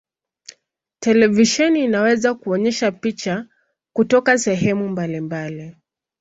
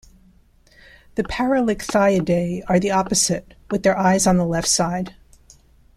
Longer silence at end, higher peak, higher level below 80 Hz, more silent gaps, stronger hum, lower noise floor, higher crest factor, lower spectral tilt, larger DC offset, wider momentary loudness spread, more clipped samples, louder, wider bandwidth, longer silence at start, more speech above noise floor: second, 0.5 s vs 0.85 s; about the same, -2 dBFS vs -4 dBFS; second, -58 dBFS vs -44 dBFS; neither; neither; first, -62 dBFS vs -54 dBFS; about the same, 18 dB vs 16 dB; about the same, -4.5 dB/octave vs -4.5 dB/octave; neither; about the same, 12 LU vs 11 LU; neither; about the same, -18 LUFS vs -19 LUFS; second, 8 kHz vs 14.5 kHz; second, 1 s vs 1.15 s; first, 45 dB vs 34 dB